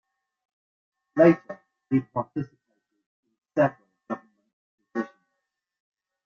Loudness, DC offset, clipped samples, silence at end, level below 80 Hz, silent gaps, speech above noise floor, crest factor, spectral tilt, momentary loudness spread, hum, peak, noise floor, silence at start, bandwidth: -25 LUFS; under 0.1%; under 0.1%; 1.2 s; -68 dBFS; 3.06-3.23 s, 4.53-4.78 s; 60 dB; 24 dB; -9.5 dB/octave; 19 LU; none; -6 dBFS; -82 dBFS; 1.15 s; 6.8 kHz